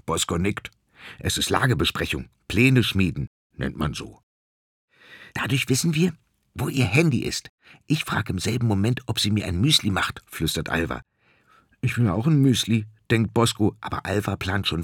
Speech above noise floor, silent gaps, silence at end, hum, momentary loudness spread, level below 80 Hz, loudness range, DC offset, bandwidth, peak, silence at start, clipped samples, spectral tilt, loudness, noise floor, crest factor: 36 dB; 3.27-3.50 s, 4.23-4.88 s, 7.49-7.58 s; 0 s; none; 12 LU; -48 dBFS; 4 LU; under 0.1%; 19 kHz; -4 dBFS; 0.05 s; under 0.1%; -5 dB/octave; -23 LUFS; -59 dBFS; 20 dB